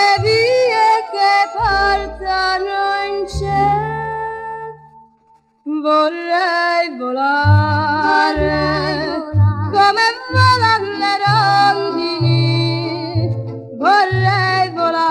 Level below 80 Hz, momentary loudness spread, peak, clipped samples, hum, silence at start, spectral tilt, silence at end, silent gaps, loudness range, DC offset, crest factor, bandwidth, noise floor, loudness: -38 dBFS; 9 LU; 0 dBFS; under 0.1%; none; 0 s; -6 dB/octave; 0 s; none; 5 LU; under 0.1%; 14 dB; 11 kHz; -54 dBFS; -15 LUFS